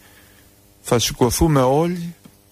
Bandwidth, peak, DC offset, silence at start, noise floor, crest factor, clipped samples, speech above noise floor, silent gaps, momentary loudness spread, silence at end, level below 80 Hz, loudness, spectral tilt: 15.5 kHz; -4 dBFS; under 0.1%; 0.85 s; -51 dBFS; 16 dB; under 0.1%; 34 dB; none; 16 LU; 0.4 s; -36 dBFS; -18 LUFS; -5 dB/octave